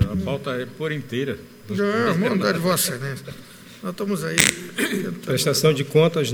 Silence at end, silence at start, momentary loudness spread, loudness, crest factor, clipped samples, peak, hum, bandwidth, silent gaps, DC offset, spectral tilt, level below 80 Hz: 0 s; 0 s; 15 LU; -22 LUFS; 22 dB; under 0.1%; 0 dBFS; none; over 20 kHz; none; under 0.1%; -4 dB/octave; -50 dBFS